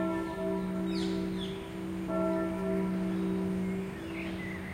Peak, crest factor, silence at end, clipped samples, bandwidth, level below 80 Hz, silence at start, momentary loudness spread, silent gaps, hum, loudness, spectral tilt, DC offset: -18 dBFS; 14 dB; 0 s; under 0.1%; 15.5 kHz; -52 dBFS; 0 s; 6 LU; none; none; -34 LUFS; -7 dB/octave; under 0.1%